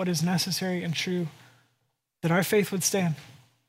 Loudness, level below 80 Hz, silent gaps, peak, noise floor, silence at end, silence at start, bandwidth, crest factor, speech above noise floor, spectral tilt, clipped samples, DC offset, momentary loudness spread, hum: -27 LUFS; -70 dBFS; none; -10 dBFS; -76 dBFS; 0.35 s; 0 s; 16 kHz; 18 dB; 49 dB; -4.5 dB/octave; under 0.1%; under 0.1%; 9 LU; none